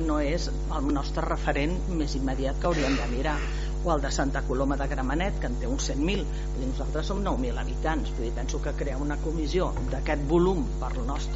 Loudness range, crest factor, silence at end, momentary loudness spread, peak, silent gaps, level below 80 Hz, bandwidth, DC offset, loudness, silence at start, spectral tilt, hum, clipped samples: 2 LU; 16 dB; 0 s; 5 LU; -10 dBFS; none; -30 dBFS; 8 kHz; under 0.1%; -29 LUFS; 0 s; -5.5 dB/octave; none; under 0.1%